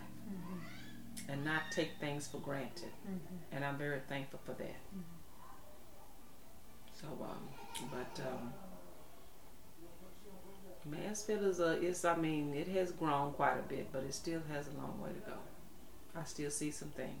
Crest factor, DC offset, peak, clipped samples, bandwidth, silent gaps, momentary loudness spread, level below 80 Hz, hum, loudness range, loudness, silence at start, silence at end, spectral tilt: 24 dB; 0.4%; -18 dBFS; under 0.1%; over 20 kHz; none; 23 LU; -64 dBFS; none; 13 LU; -41 LUFS; 0 s; 0 s; -4.5 dB/octave